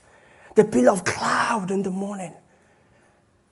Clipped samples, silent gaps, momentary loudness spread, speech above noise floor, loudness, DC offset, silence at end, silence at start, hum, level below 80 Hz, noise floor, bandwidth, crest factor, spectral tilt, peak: under 0.1%; none; 13 LU; 39 dB; -22 LUFS; under 0.1%; 1.2 s; 0.55 s; none; -62 dBFS; -60 dBFS; 11.5 kHz; 22 dB; -5 dB/octave; -2 dBFS